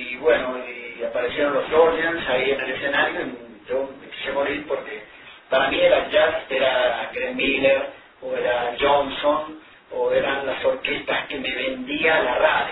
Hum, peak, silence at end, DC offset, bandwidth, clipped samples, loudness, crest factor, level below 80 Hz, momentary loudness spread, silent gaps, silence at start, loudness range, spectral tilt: none; -4 dBFS; 0 s; under 0.1%; 4.1 kHz; under 0.1%; -22 LUFS; 18 dB; -52 dBFS; 13 LU; none; 0 s; 3 LU; -7 dB/octave